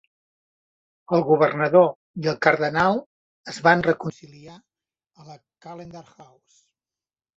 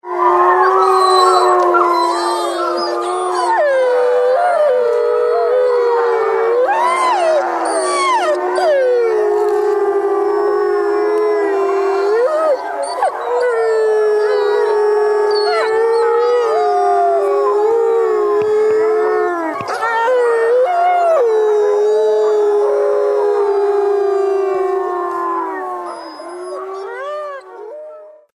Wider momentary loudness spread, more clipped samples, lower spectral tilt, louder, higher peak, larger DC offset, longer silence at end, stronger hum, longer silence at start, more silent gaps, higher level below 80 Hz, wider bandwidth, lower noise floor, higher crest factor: first, 23 LU vs 8 LU; neither; first, -6.5 dB/octave vs -3 dB/octave; second, -20 LUFS vs -14 LUFS; about the same, -2 dBFS vs 0 dBFS; neither; first, 1.15 s vs 0.25 s; neither; first, 1.1 s vs 0.05 s; first, 1.95-2.14 s, 3.06-3.44 s vs none; about the same, -62 dBFS vs -64 dBFS; second, 7.8 kHz vs 13 kHz; first, under -90 dBFS vs -36 dBFS; first, 22 dB vs 14 dB